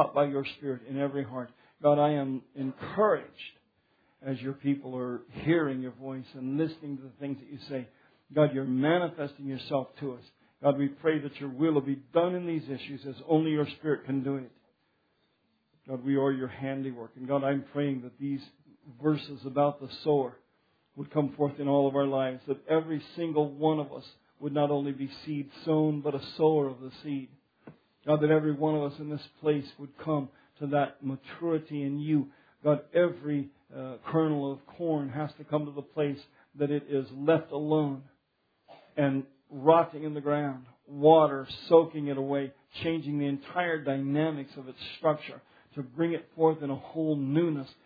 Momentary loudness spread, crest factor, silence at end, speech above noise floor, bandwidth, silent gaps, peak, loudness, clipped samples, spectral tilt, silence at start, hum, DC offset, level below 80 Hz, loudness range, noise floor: 14 LU; 24 dB; 0.15 s; 45 dB; 5 kHz; none; -6 dBFS; -30 LUFS; under 0.1%; -10 dB/octave; 0 s; none; under 0.1%; -74 dBFS; 6 LU; -75 dBFS